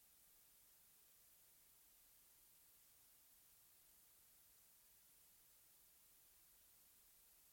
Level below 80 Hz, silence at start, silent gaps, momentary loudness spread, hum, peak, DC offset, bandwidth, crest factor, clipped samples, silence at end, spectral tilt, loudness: -90 dBFS; 0 s; none; 0 LU; none; -58 dBFS; under 0.1%; 17 kHz; 14 dB; under 0.1%; 0 s; -0.5 dB/octave; -68 LUFS